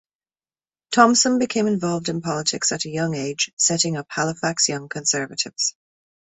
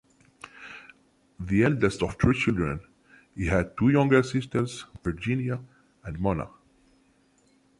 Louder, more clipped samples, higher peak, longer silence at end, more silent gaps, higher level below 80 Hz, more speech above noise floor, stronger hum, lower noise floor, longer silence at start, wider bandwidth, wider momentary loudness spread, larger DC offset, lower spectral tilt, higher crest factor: first, -21 LUFS vs -26 LUFS; neither; first, -2 dBFS vs -8 dBFS; second, 0.65 s vs 1.3 s; first, 3.53-3.57 s vs none; second, -62 dBFS vs -44 dBFS; first, over 69 dB vs 39 dB; neither; first, under -90 dBFS vs -64 dBFS; first, 0.9 s vs 0.55 s; second, 8.4 kHz vs 11.5 kHz; second, 8 LU vs 21 LU; neither; second, -3 dB/octave vs -7 dB/octave; about the same, 20 dB vs 20 dB